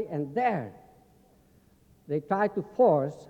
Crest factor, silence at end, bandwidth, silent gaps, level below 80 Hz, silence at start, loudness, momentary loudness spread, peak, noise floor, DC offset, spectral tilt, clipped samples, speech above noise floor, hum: 18 dB; 0.05 s; 8.2 kHz; none; -68 dBFS; 0 s; -27 LUFS; 11 LU; -12 dBFS; -61 dBFS; under 0.1%; -9 dB/octave; under 0.1%; 34 dB; none